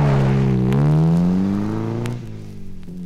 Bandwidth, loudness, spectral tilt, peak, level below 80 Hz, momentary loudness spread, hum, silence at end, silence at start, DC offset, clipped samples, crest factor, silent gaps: 9.2 kHz; -18 LUFS; -9 dB/octave; -6 dBFS; -36 dBFS; 20 LU; none; 0 s; 0 s; under 0.1%; under 0.1%; 12 dB; none